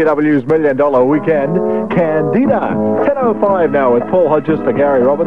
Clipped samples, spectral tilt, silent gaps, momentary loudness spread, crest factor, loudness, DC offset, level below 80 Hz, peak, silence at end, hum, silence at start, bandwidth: under 0.1%; -9.5 dB/octave; none; 3 LU; 10 dB; -13 LUFS; 1%; -48 dBFS; -2 dBFS; 0 s; none; 0 s; 5.2 kHz